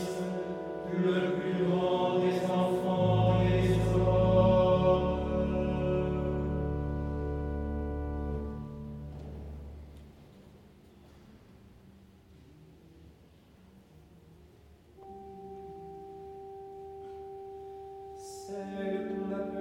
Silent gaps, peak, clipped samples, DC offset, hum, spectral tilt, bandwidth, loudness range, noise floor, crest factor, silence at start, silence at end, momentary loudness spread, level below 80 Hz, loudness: none; -14 dBFS; under 0.1%; under 0.1%; none; -8 dB/octave; 12.5 kHz; 22 LU; -58 dBFS; 18 dB; 0 s; 0 s; 20 LU; -44 dBFS; -30 LUFS